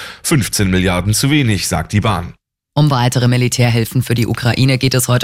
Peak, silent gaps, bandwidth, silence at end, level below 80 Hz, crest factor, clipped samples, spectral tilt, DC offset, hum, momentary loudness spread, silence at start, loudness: -2 dBFS; none; 16 kHz; 0 s; -36 dBFS; 12 dB; under 0.1%; -5 dB/octave; under 0.1%; none; 4 LU; 0 s; -14 LUFS